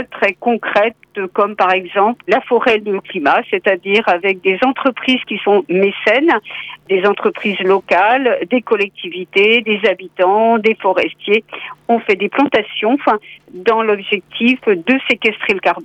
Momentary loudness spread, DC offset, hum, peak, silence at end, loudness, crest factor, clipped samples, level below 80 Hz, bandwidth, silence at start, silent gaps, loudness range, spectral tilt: 6 LU; under 0.1%; none; -2 dBFS; 0 s; -14 LUFS; 14 dB; under 0.1%; -60 dBFS; 8.4 kHz; 0 s; none; 2 LU; -6 dB/octave